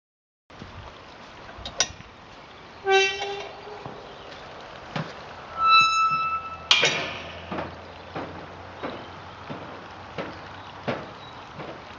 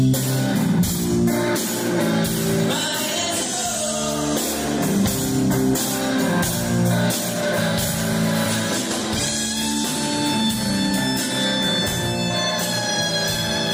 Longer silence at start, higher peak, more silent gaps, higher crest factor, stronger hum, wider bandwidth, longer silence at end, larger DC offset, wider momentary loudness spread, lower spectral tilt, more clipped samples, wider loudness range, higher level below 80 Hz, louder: first, 0.5 s vs 0 s; first, 0 dBFS vs -8 dBFS; neither; first, 28 dB vs 12 dB; neither; second, 10 kHz vs 16.5 kHz; about the same, 0 s vs 0 s; neither; first, 24 LU vs 2 LU; second, -2 dB/octave vs -4 dB/octave; neither; first, 14 LU vs 1 LU; second, -58 dBFS vs -44 dBFS; second, -24 LUFS vs -20 LUFS